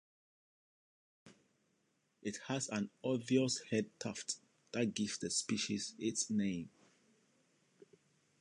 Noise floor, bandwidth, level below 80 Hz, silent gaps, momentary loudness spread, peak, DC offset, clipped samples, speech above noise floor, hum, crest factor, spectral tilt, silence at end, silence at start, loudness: -79 dBFS; 11.5 kHz; -76 dBFS; none; 11 LU; -20 dBFS; under 0.1%; under 0.1%; 41 dB; none; 22 dB; -4 dB/octave; 1.7 s; 1.25 s; -38 LUFS